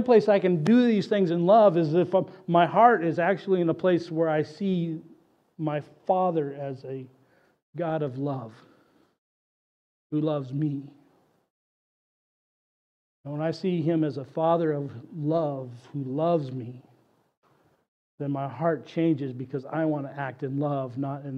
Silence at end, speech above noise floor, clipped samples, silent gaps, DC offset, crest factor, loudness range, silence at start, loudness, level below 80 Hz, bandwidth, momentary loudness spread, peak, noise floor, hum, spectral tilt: 0 s; 39 dB; under 0.1%; 7.63-7.73 s, 9.18-10.10 s, 11.50-13.24 s, 17.37-17.42 s, 17.88-18.18 s; under 0.1%; 22 dB; 12 LU; 0 s; -26 LUFS; -78 dBFS; 8.4 kHz; 16 LU; -6 dBFS; -64 dBFS; none; -8.5 dB/octave